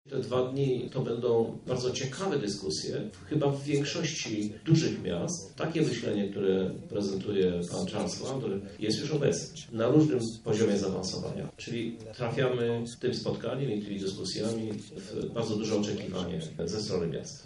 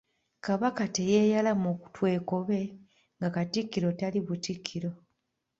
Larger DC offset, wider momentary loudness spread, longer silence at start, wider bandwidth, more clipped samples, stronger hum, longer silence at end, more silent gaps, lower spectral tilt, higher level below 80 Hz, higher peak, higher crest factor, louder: neither; second, 8 LU vs 11 LU; second, 0.05 s vs 0.45 s; first, 11.5 kHz vs 7.8 kHz; neither; neither; second, 0 s vs 0.65 s; neither; about the same, -5.5 dB/octave vs -6 dB/octave; first, -62 dBFS vs -68 dBFS; about the same, -10 dBFS vs -12 dBFS; about the same, 20 dB vs 18 dB; about the same, -31 LUFS vs -30 LUFS